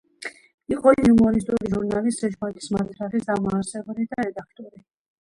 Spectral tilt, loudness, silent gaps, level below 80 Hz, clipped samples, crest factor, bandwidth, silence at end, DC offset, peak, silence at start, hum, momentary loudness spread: -6.5 dB/octave; -22 LUFS; 0.54-0.58 s; -48 dBFS; under 0.1%; 20 dB; 11.5 kHz; 0.55 s; under 0.1%; -2 dBFS; 0.2 s; none; 18 LU